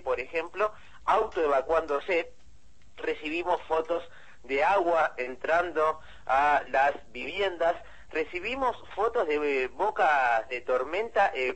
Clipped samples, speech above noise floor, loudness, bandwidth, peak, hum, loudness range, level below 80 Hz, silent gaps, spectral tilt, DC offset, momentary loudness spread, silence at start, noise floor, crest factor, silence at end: under 0.1%; 31 dB; -28 LUFS; 8.6 kHz; -10 dBFS; none; 3 LU; -56 dBFS; none; -4 dB/octave; 0.5%; 9 LU; 0.05 s; -59 dBFS; 18 dB; 0 s